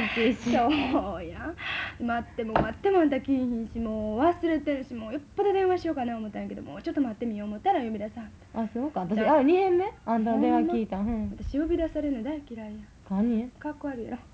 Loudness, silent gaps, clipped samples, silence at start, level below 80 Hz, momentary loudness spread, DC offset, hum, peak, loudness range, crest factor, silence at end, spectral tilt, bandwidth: -28 LUFS; none; under 0.1%; 0 s; -48 dBFS; 12 LU; under 0.1%; none; -10 dBFS; 5 LU; 18 dB; 0.05 s; -7 dB/octave; 8 kHz